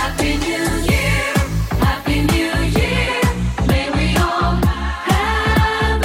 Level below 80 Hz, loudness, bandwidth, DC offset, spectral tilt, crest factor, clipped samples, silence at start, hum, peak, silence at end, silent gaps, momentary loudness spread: -22 dBFS; -17 LUFS; 16.5 kHz; under 0.1%; -5 dB/octave; 14 dB; under 0.1%; 0 s; none; -2 dBFS; 0 s; none; 3 LU